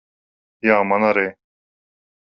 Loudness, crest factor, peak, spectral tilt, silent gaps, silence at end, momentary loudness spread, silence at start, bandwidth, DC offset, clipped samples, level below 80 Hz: -18 LUFS; 20 dB; -2 dBFS; -4.5 dB/octave; none; 0.95 s; 7 LU; 0.65 s; 6 kHz; under 0.1%; under 0.1%; -64 dBFS